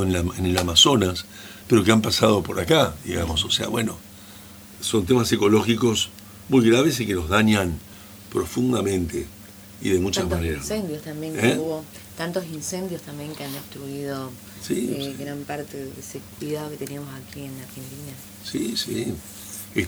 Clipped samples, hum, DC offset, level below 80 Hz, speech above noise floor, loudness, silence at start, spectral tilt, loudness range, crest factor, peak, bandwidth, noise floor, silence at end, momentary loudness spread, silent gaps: under 0.1%; none; under 0.1%; -44 dBFS; 20 dB; -22 LUFS; 0 s; -4.5 dB/octave; 11 LU; 22 dB; 0 dBFS; over 20 kHz; -43 dBFS; 0 s; 19 LU; none